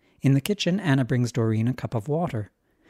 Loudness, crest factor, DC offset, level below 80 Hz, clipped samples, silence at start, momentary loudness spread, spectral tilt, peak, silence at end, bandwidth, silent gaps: -25 LUFS; 18 dB; under 0.1%; -58 dBFS; under 0.1%; 0.25 s; 7 LU; -6.5 dB/octave; -6 dBFS; 0.45 s; 15.5 kHz; none